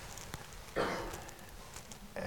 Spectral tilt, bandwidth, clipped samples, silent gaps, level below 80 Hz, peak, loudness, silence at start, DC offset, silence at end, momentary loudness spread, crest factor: -3.5 dB/octave; 18 kHz; under 0.1%; none; -54 dBFS; -22 dBFS; -42 LUFS; 0 s; 0.1%; 0 s; 13 LU; 22 dB